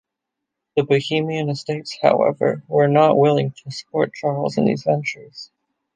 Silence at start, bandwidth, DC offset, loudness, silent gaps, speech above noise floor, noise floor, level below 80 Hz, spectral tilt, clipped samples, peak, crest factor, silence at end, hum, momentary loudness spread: 0.75 s; 9.4 kHz; under 0.1%; -19 LUFS; none; 63 dB; -82 dBFS; -64 dBFS; -6.5 dB/octave; under 0.1%; -2 dBFS; 18 dB; 0.5 s; none; 13 LU